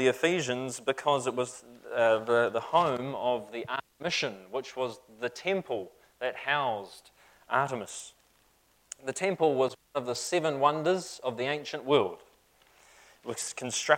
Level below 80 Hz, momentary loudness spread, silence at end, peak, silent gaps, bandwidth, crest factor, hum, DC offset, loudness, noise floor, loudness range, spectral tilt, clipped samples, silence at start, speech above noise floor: -74 dBFS; 12 LU; 0 s; -6 dBFS; none; 16.5 kHz; 24 dB; none; under 0.1%; -30 LUFS; -67 dBFS; 5 LU; -3.5 dB/octave; under 0.1%; 0 s; 37 dB